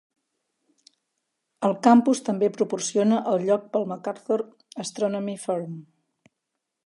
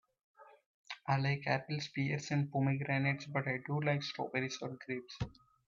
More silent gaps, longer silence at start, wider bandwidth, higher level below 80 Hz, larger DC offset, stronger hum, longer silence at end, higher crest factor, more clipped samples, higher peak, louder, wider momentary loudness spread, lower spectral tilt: second, none vs 0.66-0.84 s; first, 1.6 s vs 0.4 s; first, 11.5 kHz vs 7.4 kHz; second, -78 dBFS vs -66 dBFS; neither; neither; first, 1.05 s vs 0.35 s; about the same, 22 dB vs 20 dB; neither; first, -4 dBFS vs -16 dBFS; first, -24 LUFS vs -37 LUFS; first, 16 LU vs 10 LU; about the same, -5.5 dB/octave vs -6 dB/octave